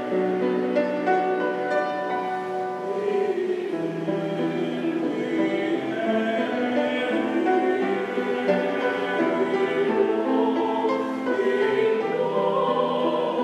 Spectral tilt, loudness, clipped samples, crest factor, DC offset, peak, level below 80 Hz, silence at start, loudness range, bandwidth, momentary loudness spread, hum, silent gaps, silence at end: -6.5 dB/octave; -24 LUFS; under 0.1%; 16 dB; under 0.1%; -8 dBFS; -76 dBFS; 0 s; 3 LU; 11 kHz; 5 LU; none; none; 0 s